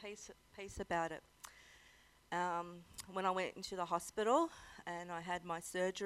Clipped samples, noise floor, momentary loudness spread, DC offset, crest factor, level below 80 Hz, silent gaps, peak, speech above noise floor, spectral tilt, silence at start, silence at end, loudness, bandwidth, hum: under 0.1%; -67 dBFS; 19 LU; under 0.1%; 22 dB; -68 dBFS; none; -20 dBFS; 26 dB; -4 dB/octave; 0 s; 0 s; -41 LUFS; 16 kHz; none